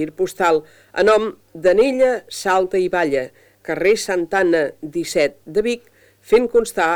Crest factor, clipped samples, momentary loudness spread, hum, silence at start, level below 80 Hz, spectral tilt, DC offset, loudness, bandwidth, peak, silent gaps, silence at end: 16 dB; under 0.1%; 10 LU; none; 0 s; -50 dBFS; -4 dB/octave; under 0.1%; -18 LUFS; 20 kHz; -2 dBFS; none; 0 s